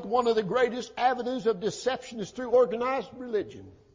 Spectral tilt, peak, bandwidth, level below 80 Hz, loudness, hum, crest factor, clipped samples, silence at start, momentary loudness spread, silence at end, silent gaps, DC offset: -4.5 dB/octave; -12 dBFS; 7.6 kHz; -64 dBFS; -28 LUFS; none; 16 dB; under 0.1%; 0 s; 10 LU; 0.2 s; none; under 0.1%